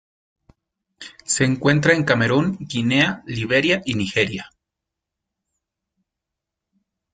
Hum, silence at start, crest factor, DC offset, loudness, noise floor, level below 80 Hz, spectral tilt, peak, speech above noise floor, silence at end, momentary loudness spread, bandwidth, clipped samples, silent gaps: none; 1 s; 20 dB; under 0.1%; -19 LUFS; -84 dBFS; -54 dBFS; -4.5 dB/octave; -2 dBFS; 65 dB; 2.7 s; 13 LU; 9.6 kHz; under 0.1%; none